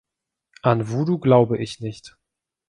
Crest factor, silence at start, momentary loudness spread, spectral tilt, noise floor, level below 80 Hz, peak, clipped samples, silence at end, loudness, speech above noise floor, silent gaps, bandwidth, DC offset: 20 dB; 0.65 s; 16 LU; -8 dB/octave; -84 dBFS; -60 dBFS; -2 dBFS; under 0.1%; 0.6 s; -20 LUFS; 65 dB; none; 10.5 kHz; under 0.1%